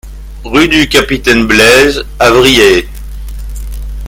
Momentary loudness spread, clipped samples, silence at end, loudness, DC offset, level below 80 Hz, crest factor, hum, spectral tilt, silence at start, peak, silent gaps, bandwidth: 21 LU; 2%; 0 s; -7 LUFS; under 0.1%; -22 dBFS; 10 dB; none; -3.5 dB/octave; 0.05 s; 0 dBFS; none; over 20 kHz